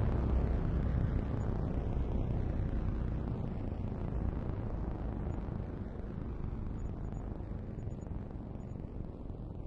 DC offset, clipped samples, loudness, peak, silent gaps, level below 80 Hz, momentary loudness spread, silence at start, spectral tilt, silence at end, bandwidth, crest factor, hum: under 0.1%; under 0.1%; -38 LUFS; -20 dBFS; none; -38 dBFS; 10 LU; 0 s; -10 dB/octave; 0 s; 7.2 kHz; 16 dB; none